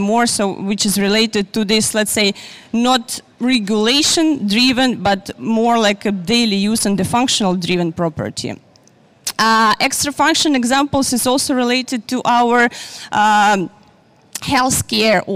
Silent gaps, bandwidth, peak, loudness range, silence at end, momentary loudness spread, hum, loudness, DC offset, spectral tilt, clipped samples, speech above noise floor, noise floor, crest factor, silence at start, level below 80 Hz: none; 16 kHz; -4 dBFS; 2 LU; 0 s; 9 LU; none; -15 LUFS; under 0.1%; -3 dB/octave; under 0.1%; 35 dB; -50 dBFS; 12 dB; 0 s; -48 dBFS